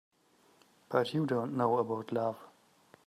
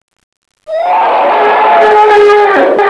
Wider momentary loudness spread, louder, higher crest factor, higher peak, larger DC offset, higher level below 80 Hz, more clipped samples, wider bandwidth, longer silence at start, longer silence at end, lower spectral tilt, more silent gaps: about the same, 5 LU vs 7 LU; second, -33 LUFS vs -7 LUFS; first, 20 dB vs 8 dB; second, -14 dBFS vs 0 dBFS; second, under 0.1% vs 0.3%; second, -80 dBFS vs -50 dBFS; second, under 0.1% vs 1%; first, 14 kHz vs 11 kHz; first, 0.9 s vs 0.7 s; first, 0.6 s vs 0 s; first, -7.5 dB/octave vs -3.5 dB/octave; neither